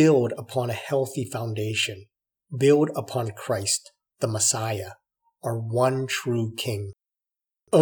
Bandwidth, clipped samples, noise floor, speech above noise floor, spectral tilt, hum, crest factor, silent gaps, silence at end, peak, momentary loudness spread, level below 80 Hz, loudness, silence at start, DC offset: 20 kHz; under 0.1%; -90 dBFS; 65 dB; -4.5 dB/octave; none; 20 dB; none; 0 s; -6 dBFS; 12 LU; -72 dBFS; -25 LUFS; 0 s; under 0.1%